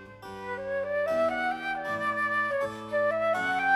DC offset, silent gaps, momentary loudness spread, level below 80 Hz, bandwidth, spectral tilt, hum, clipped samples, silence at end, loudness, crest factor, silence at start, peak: under 0.1%; none; 9 LU; -64 dBFS; 13.5 kHz; -4.5 dB/octave; none; under 0.1%; 0 s; -29 LUFS; 16 dB; 0 s; -14 dBFS